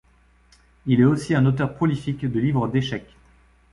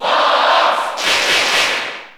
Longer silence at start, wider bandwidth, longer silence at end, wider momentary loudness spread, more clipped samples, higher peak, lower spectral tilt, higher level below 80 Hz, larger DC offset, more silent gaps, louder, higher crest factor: first, 0.85 s vs 0 s; second, 11.5 kHz vs over 20 kHz; first, 0.7 s vs 0.05 s; first, 10 LU vs 5 LU; neither; second, -6 dBFS vs -2 dBFS; first, -7.5 dB/octave vs 0 dB/octave; about the same, -50 dBFS vs -54 dBFS; neither; neither; second, -22 LUFS vs -13 LUFS; about the same, 16 dB vs 14 dB